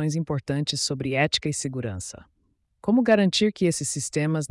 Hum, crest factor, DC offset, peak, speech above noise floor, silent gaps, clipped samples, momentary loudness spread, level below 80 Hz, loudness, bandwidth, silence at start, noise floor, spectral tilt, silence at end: none; 16 dB; under 0.1%; -10 dBFS; 33 dB; none; under 0.1%; 12 LU; -58 dBFS; -24 LUFS; 12 kHz; 0 s; -57 dBFS; -4.5 dB/octave; 0.05 s